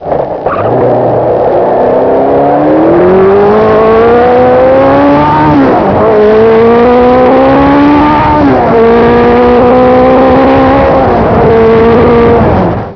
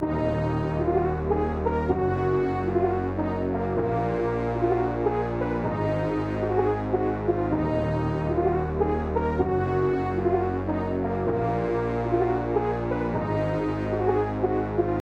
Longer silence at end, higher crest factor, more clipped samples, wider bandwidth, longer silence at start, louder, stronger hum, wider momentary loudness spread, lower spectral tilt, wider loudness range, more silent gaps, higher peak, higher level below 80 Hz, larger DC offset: about the same, 0 s vs 0 s; second, 4 dB vs 14 dB; first, 5% vs under 0.1%; second, 5.4 kHz vs 7 kHz; about the same, 0 s vs 0 s; first, -5 LUFS vs -26 LUFS; neither; about the same, 3 LU vs 3 LU; about the same, -9 dB/octave vs -9.5 dB/octave; about the same, 1 LU vs 1 LU; neither; first, 0 dBFS vs -10 dBFS; first, -26 dBFS vs -40 dBFS; first, 0.2% vs under 0.1%